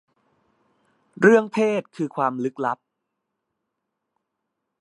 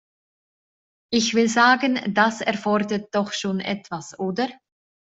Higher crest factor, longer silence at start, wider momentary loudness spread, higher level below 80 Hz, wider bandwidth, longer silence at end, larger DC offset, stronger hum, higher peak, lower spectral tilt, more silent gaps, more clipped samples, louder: about the same, 22 dB vs 20 dB; about the same, 1.2 s vs 1.1 s; about the same, 12 LU vs 12 LU; second, -70 dBFS vs -64 dBFS; first, 11 kHz vs 8.2 kHz; first, 2.05 s vs 0.6 s; neither; neither; about the same, -2 dBFS vs -4 dBFS; first, -6.5 dB/octave vs -4 dB/octave; neither; neither; about the same, -21 LUFS vs -22 LUFS